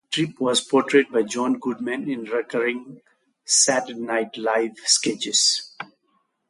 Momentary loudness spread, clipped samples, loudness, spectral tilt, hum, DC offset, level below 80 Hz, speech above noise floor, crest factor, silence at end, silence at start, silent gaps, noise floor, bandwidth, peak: 10 LU; under 0.1%; -21 LUFS; -2 dB/octave; none; under 0.1%; -72 dBFS; 47 dB; 20 dB; 0.65 s; 0.1 s; none; -69 dBFS; 11.5 kHz; -4 dBFS